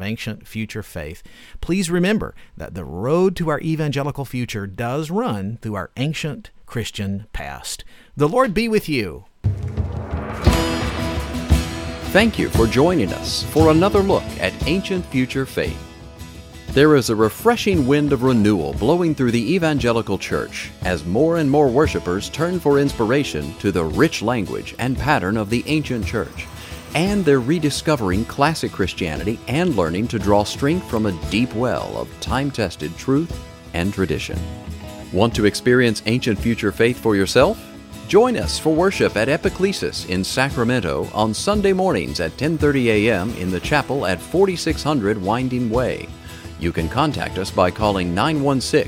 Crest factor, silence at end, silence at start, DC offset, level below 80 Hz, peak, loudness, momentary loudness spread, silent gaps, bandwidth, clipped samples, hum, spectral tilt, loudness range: 20 dB; 0 s; 0 s; under 0.1%; -34 dBFS; 0 dBFS; -20 LUFS; 13 LU; none; 17 kHz; under 0.1%; none; -5.5 dB/octave; 5 LU